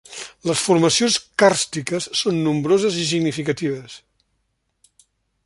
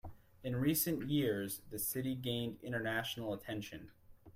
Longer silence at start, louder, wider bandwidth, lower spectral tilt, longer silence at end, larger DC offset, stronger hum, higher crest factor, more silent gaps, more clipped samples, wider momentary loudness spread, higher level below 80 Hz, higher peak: about the same, 0.1 s vs 0.05 s; first, -19 LUFS vs -38 LUFS; second, 11.5 kHz vs 16 kHz; about the same, -4 dB/octave vs -4.5 dB/octave; first, 1.5 s vs 0.05 s; neither; neither; about the same, 20 dB vs 18 dB; neither; neither; about the same, 11 LU vs 11 LU; first, -60 dBFS vs -66 dBFS; first, -2 dBFS vs -22 dBFS